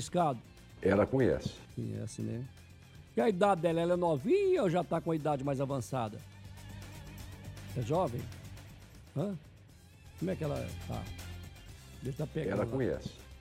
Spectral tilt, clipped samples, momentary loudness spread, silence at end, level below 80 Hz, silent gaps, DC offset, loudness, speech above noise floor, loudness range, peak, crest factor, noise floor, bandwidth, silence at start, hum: -7 dB/octave; under 0.1%; 20 LU; 0 s; -56 dBFS; none; under 0.1%; -34 LUFS; 24 dB; 10 LU; -14 dBFS; 20 dB; -56 dBFS; 16 kHz; 0 s; none